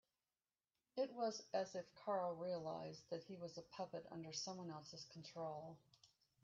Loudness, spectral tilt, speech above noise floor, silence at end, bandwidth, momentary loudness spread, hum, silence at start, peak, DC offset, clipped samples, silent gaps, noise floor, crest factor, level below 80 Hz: -49 LUFS; -4.5 dB/octave; over 41 dB; 0.4 s; 7.8 kHz; 11 LU; none; 0.95 s; -30 dBFS; under 0.1%; under 0.1%; none; under -90 dBFS; 20 dB; -88 dBFS